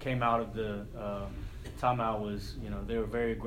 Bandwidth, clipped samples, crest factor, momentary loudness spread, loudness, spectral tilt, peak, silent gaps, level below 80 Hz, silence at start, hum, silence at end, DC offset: 16 kHz; under 0.1%; 20 dB; 10 LU; -34 LUFS; -7 dB/octave; -14 dBFS; none; -46 dBFS; 0 s; none; 0 s; under 0.1%